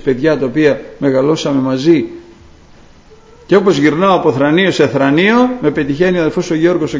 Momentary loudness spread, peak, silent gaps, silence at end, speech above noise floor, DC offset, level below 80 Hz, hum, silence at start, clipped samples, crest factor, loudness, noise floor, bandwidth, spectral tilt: 5 LU; 0 dBFS; none; 0 s; 29 dB; under 0.1%; -46 dBFS; none; 0.05 s; under 0.1%; 12 dB; -12 LUFS; -41 dBFS; 7.8 kHz; -6.5 dB/octave